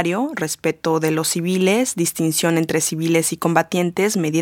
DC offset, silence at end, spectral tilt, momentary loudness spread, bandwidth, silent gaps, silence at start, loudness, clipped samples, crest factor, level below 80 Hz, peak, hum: under 0.1%; 0 s; -4.5 dB/octave; 4 LU; 17.5 kHz; none; 0 s; -19 LUFS; under 0.1%; 18 dB; -62 dBFS; 0 dBFS; none